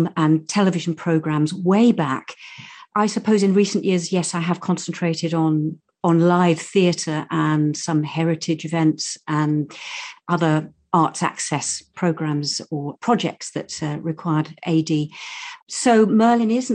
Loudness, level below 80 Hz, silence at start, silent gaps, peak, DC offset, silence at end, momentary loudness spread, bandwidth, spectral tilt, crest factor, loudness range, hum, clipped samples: -20 LUFS; -66 dBFS; 0 s; 15.62-15.67 s; -4 dBFS; under 0.1%; 0 s; 12 LU; 10 kHz; -5.5 dB/octave; 16 dB; 4 LU; none; under 0.1%